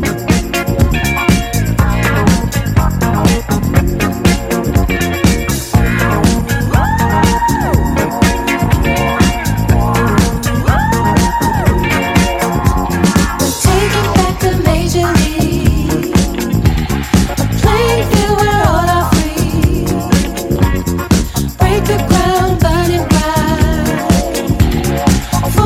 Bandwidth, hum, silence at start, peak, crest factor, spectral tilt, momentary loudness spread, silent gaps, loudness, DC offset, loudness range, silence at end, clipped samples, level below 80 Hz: 16.5 kHz; none; 0 s; 0 dBFS; 12 dB; -5.5 dB/octave; 3 LU; none; -13 LUFS; under 0.1%; 1 LU; 0 s; under 0.1%; -20 dBFS